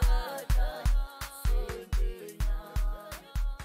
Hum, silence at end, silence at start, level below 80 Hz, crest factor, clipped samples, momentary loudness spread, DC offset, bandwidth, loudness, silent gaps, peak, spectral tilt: none; 0 s; 0 s; -30 dBFS; 14 dB; under 0.1%; 7 LU; under 0.1%; 16 kHz; -34 LUFS; none; -16 dBFS; -5 dB/octave